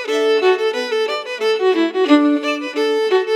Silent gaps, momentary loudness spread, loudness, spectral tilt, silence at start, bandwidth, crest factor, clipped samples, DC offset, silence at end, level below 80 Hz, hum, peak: none; 6 LU; -17 LUFS; -2 dB/octave; 0 s; 12.5 kHz; 16 dB; under 0.1%; under 0.1%; 0 s; -88 dBFS; none; 0 dBFS